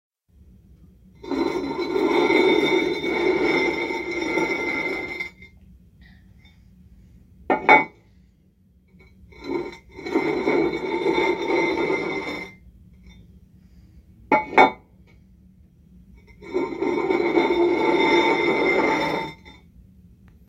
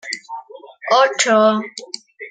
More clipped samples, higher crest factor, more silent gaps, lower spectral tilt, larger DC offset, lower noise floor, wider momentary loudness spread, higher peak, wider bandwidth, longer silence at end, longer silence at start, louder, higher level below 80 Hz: neither; first, 24 dB vs 18 dB; neither; first, -5 dB/octave vs -2.5 dB/octave; neither; first, -58 dBFS vs -37 dBFS; second, 14 LU vs 19 LU; about the same, 0 dBFS vs 0 dBFS; first, 13.5 kHz vs 9.6 kHz; first, 0.95 s vs 0 s; first, 1.2 s vs 0.05 s; second, -21 LUFS vs -15 LUFS; first, -52 dBFS vs -72 dBFS